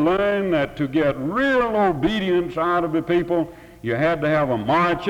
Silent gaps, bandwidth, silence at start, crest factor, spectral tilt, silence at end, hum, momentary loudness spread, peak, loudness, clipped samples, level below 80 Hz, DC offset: none; 13 kHz; 0 s; 12 dB; -7.5 dB/octave; 0 s; none; 4 LU; -8 dBFS; -21 LUFS; under 0.1%; -46 dBFS; under 0.1%